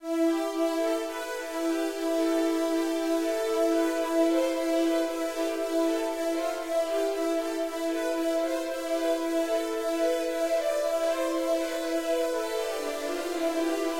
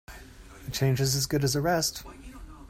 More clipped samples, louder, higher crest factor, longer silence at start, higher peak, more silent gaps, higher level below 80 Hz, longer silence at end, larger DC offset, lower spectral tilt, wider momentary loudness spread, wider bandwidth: neither; about the same, -28 LUFS vs -27 LUFS; about the same, 12 dB vs 16 dB; about the same, 0 s vs 0.1 s; second, -16 dBFS vs -12 dBFS; neither; second, -64 dBFS vs -48 dBFS; about the same, 0 s vs 0.05 s; neither; second, -2 dB/octave vs -4.5 dB/octave; second, 5 LU vs 21 LU; about the same, 16.5 kHz vs 16 kHz